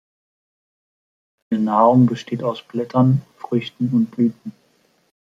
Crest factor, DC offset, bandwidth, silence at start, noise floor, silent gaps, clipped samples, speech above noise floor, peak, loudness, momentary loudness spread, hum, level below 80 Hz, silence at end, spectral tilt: 18 dB; under 0.1%; 7.4 kHz; 1.5 s; -61 dBFS; none; under 0.1%; 43 dB; -2 dBFS; -19 LUFS; 12 LU; none; -64 dBFS; 0.85 s; -9 dB/octave